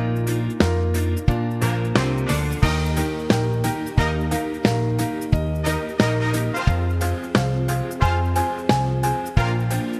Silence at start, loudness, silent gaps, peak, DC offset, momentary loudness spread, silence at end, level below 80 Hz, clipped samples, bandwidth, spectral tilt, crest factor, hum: 0 s; -22 LUFS; none; 0 dBFS; under 0.1%; 3 LU; 0 s; -30 dBFS; under 0.1%; 14 kHz; -6 dB/octave; 20 dB; none